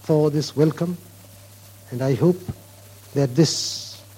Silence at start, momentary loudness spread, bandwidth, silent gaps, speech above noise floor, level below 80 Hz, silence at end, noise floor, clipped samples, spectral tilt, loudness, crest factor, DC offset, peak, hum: 0.05 s; 16 LU; 16.5 kHz; none; 25 dB; -56 dBFS; 0.15 s; -45 dBFS; under 0.1%; -6 dB/octave; -22 LUFS; 18 dB; under 0.1%; -4 dBFS; none